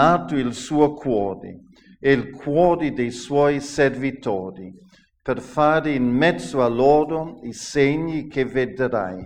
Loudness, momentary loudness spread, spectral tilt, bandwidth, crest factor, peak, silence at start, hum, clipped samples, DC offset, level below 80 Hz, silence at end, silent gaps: -21 LUFS; 10 LU; -6 dB/octave; 10.5 kHz; 18 dB; -2 dBFS; 0 s; none; under 0.1%; under 0.1%; -48 dBFS; 0 s; none